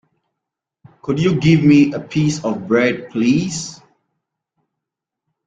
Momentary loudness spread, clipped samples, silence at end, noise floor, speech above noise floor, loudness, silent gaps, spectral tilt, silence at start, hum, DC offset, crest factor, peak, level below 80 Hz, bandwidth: 13 LU; under 0.1%; 1.7 s; -82 dBFS; 67 dB; -16 LUFS; none; -6 dB/octave; 1.05 s; none; under 0.1%; 16 dB; -2 dBFS; -52 dBFS; 9.2 kHz